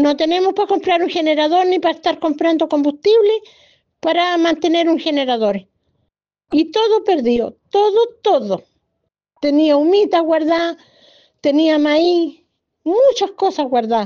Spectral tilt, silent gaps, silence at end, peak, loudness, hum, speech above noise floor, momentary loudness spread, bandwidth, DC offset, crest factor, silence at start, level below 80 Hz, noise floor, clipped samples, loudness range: -4.5 dB/octave; none; 0 s; -4 dBFS; -16 LUFS; none; 58 dB; 7 LU; 7 kHz; under 0.1%; 12 dB; 0 s; -60 dBFS; -73 dBFS; under 0.1%; 2 LU